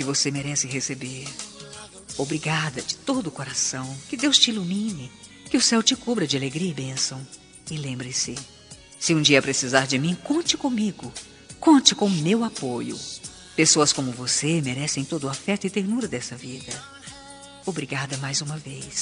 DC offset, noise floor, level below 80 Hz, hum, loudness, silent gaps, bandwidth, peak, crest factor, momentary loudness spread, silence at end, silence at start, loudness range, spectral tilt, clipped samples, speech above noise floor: under 0.1%; -44 dBFS; -60 dBFS; none; -23 LUFS; none; 10.5 kHz; 0 dBFS; 24 dB; 19 LU; 0 s; 0 s; 7 LU; -3 dB/octave; under 0.1%; 20 dB